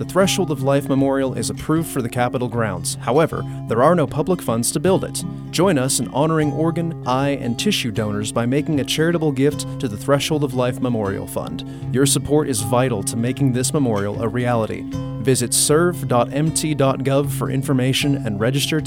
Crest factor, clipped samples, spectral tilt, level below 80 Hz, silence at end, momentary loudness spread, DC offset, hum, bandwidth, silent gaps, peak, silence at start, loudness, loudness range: 18 dB; under 0.1%; -5 dB/octave; -46 dBFS; 0 s; 7 LU; under 0.1%; none; 18 kHz; none; -2 dBFS; 0 s; -19 LUFS; 2 LU